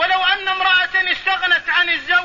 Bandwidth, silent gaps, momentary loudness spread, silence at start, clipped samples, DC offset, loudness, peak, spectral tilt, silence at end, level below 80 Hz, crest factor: 7.4 kHz; none; 3 LU; 0 s; under 0.1%; 0.3%; -15 LUFS; -4 dBFS; -1 dB/octave; 0 s; -52 dBFS; 14 dB